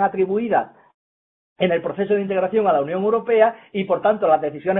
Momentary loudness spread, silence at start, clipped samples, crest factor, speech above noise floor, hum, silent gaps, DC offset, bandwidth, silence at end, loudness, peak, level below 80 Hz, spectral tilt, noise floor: 5 LU; 0 s; under 0.1%; 18 dB; over 71 dB; none; 0.94-1.56 s; under 0.1%; 3.9 kHz; 0 s; -20 LUFS; -2 dBFS; -64 dBFS; -10.5 dB/octave; under -90 dBFS